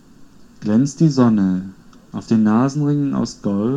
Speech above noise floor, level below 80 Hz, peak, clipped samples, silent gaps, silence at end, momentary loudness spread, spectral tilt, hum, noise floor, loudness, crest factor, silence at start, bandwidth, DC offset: 27 dB; -52 dBFS; -2 dBFS; under 0.1%; none; 0 s; 14 LU; -7.5 dB/octave; none; -44 dBFS; -17 LUFS; 16 dB; 0.2 s; 9 kHz; under 0.1%